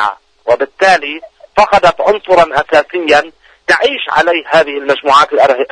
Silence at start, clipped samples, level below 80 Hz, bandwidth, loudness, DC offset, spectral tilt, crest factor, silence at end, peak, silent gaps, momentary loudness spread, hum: 0 s; 0.1%; -44 dBFS; 10.5 kHz; -11 LUFS; under 0.1%; -3.5 dB/octave; 12 dB; 0.05 s; 0 dBFS; none; 9 LU; none